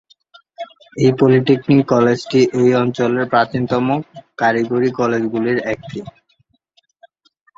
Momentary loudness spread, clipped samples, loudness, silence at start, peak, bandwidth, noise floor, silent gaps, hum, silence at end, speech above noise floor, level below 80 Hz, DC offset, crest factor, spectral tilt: 18 LU; under 0.1%; -16 LUFS; 0.6 s; -2 dBFS; 7.6 kHz; -62 dBFS; none; none; 1.45 s; 46 dB; -56 dBFS; under 0.1%; 16 dB; -7 dB/octave